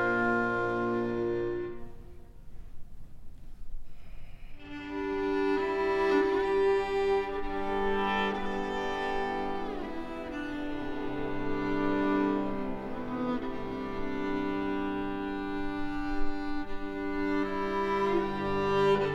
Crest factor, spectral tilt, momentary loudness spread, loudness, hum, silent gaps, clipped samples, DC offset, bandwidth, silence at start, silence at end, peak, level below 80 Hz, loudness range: 14 dB; -6.5 dB/octave; 11 LU; -31 LUFS; none; none; under 0.1%; under 0.1%; 8.4 kHz; 0 s; 0 s; -16 dBFS; -44 dBFS; 8 LU